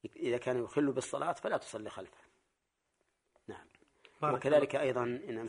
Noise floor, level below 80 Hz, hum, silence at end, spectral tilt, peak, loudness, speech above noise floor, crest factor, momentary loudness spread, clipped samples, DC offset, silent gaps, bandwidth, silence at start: -83 dBFS; -74 dBFS; none; 0 s; -5.5 dB/octave; -16 dBFS; -34 LUFS; 49 dB; 20 dB; 22 LU; under 0.1%; under 0.1%; none; 10.5 kHz; 0.05 s